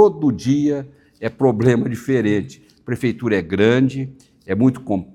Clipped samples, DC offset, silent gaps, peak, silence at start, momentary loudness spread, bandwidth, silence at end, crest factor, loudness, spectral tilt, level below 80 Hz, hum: under 0.1%; under 0.1%; none; 0 dBFS; 0 s; 13 LU; 12.5 kHz; 0.1 s; 18 dB; -19 LUFS; -7.5 dB/octave; -54 dBFS; none